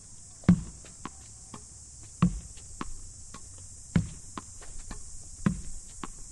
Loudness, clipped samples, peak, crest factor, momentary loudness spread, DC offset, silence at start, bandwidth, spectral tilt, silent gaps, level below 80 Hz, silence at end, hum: -33 LUFS; under 0.1%; -8 dBFS; 26 dB; 17 LU; under 0.1%; 0 s; 11.5 kHz; -6 dB/octave; none; -44 dBFS; 0 s; none